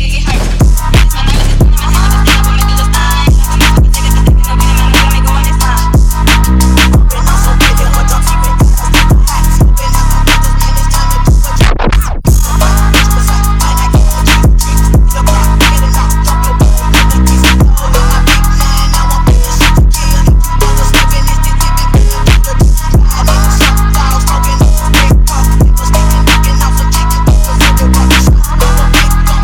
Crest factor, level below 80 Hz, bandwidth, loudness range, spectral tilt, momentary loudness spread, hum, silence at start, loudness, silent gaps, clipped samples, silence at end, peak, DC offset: 6 dB; -8 dBFS; 18.5 kHz; 1 LU; -4.5 dB/octave; 3 LU; none; 0 s; -9 LUFS; none; 0.5%; 0 s; 0 dBFS; 0.4%